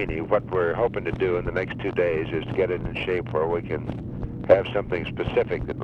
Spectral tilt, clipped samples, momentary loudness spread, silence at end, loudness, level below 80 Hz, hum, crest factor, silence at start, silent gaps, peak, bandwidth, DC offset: -8.5 dB/octave; under 0.1%; 10 LU; 0 s; -25 LUFS; -42 dBFS; none; 20 dB; 0 s; none; -4 dBFS; 6.4 kHz; under 0.1%